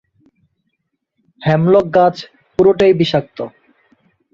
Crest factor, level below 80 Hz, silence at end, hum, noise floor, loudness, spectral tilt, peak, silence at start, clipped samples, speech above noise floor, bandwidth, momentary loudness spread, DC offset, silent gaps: 16 dB; -50 dBFS; 0.85 s; none; -72 dBFS; -14 LUFS; -7.5 dB/octave; -2 dBFS; 1.4 s; under 0.1%; 59 dB; 7.2 kHz; 17 LU; under 0.1%; none